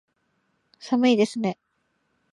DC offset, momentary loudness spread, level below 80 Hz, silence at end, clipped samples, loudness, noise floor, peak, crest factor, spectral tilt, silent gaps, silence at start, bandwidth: under 0.1%; 22 LU; -74 dBFS; 0.8 s; under 0.1%; -23 LUFS; -72 dBFS; -8 dBFS; 18 dB; -5.5 dB/octave; none; 0.85 s; 11 kHz